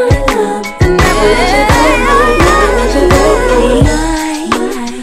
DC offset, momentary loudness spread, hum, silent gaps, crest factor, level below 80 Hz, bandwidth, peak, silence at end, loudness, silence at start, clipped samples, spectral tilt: under 0.1%; 7 LU; none; none; 8 dB; -16 dBFS; 16 kHz; 0 dBFS; 0 s; -9 LUFS; 0 s; 0.4%; -5 dB/octave